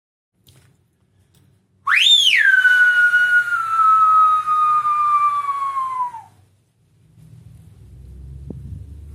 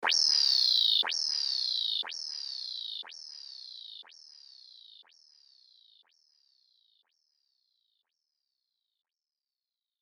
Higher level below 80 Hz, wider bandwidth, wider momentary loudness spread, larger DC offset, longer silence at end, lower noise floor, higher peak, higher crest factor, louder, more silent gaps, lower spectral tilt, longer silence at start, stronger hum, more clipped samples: first, -48 dBFS vs under -90 dBFS; second, 14.5 kHz vs 19.5 kHz; about the same, 23 LU vs 21 LU; neither; second, 0.05 s vs 5.05 s; second, -60 dBFS vs under -90 dBFS; first, -4 dBFS vs -12 dBFS; second, 16 dB vs 22 dB; first, -14 LUFS vs -27 LUFS; neither; first, 0.5 dB/octave vs 4 dB/octave; first, 1.85 s vs 0 s; neither; neither